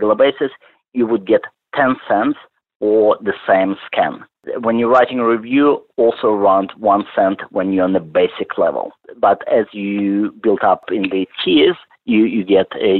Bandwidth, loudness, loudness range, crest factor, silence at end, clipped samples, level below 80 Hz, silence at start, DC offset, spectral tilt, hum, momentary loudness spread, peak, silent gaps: 4.3 kHz; -16 LUFS; 2 LU; 14 dB; 0 s; under 0.1%; -60 dBFS; 0 s; under 0.1%; -8.5 dB/octave; none; 8 LU; -2 dBFS; 2.76-2.80 s